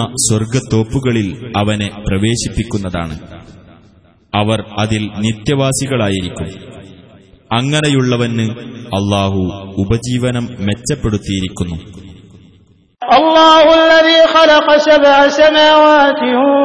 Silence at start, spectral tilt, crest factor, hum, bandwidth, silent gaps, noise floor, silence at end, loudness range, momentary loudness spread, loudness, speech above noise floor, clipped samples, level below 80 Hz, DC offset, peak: 0 s; -4.5 dB/octave; 12 dB; none; 11 kHz; none; -48 dBFS; 0 s; 11 LU; 14 LU; -12 LUFS; 36 dB; under 0.1%; -36 dBFS; under 0.1%; 0 dBFS